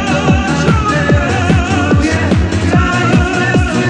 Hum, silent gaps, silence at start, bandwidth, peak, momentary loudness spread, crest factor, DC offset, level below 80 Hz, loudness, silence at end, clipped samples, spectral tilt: none; none; 0 s; 10 kHz; 0 dBFS; 1 LU; 12 dB; under 0.1%; -22 dBFS; -12 LUFS; 0 s; under 0.1%; -6 dB/octave